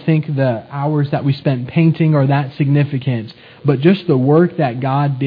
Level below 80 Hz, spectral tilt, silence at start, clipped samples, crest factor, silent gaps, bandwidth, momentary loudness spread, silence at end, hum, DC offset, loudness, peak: -58 dBFS; -11 dB/octave; 0 s; under 0.1%; 14 dB; none; 5 kHz; 7 LU; 0 s; none; under 0.1%; -16 LUFS; 0 dBFS